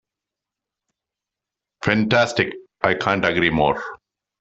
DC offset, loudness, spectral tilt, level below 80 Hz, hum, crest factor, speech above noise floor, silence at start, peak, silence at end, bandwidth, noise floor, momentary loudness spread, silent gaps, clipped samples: under 0.1%; -20 LUFS; -5.5 dB/octave; -50 dBFS; none; 20 dB; 67 dB; 1.8 s; -2 dBFS; 0.45 s; 8.2 kHz; -86 dBFS; 9 LU; none; under 0.1%